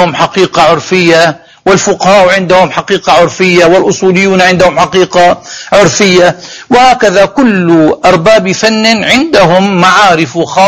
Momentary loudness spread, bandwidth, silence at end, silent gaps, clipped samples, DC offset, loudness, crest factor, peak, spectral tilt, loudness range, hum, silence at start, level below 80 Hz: 5 LU; 16 kHz; 0 s; none; 5%; under 0.1%; -6 LUFS; 6 dB; 0 dBFS; -4.5 dB/octave; 1 LU; none; 0 s; -38 dBFS